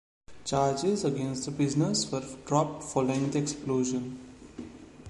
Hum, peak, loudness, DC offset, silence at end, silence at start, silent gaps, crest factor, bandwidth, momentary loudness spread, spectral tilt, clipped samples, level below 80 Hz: none; -10 dBFS; -29 LUFS; under 0.1%; 0 s; 0.3 s; none; 20 dB; 11.5 kHz; 18 LU; -5.5 dB/octave; under 0.1%; -58 dBFS